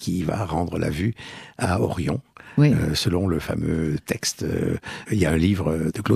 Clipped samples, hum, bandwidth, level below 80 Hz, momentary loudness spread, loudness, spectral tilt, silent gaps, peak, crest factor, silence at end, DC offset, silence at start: under 0.1%; none; 15 kHz; -40 dBFS; 8 LU; -24 LUFS; -6 dB/octave; none; -6 dBFS; 18 dB; 0 s; under 0.1%; 0 s